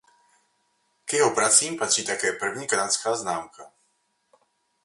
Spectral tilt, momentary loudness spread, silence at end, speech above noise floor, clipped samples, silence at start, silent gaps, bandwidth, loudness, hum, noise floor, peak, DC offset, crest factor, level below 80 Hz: -1 dB/octave; 13 LU; 1.2 s; 47 dB; under 0.1%; 1.05 s; none; 11.5 kHz; -23 LUFS; none; -71 dBFS; -4 dBFS; under 0.1%; 24 dB; -72 dBFS